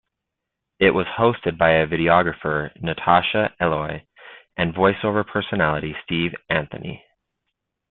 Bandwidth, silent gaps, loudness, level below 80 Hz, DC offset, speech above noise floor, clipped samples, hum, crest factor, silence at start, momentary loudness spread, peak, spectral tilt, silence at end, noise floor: 4.3 kHz; none; -20 LUFS; -50 dBFS; under 0.1%; 62 dB; under 0.1%; none; 20 dB; 0.8 s; 13 LU; -2 dBFS; -10.5 dB/octave; 0.95 s; -82 dBFS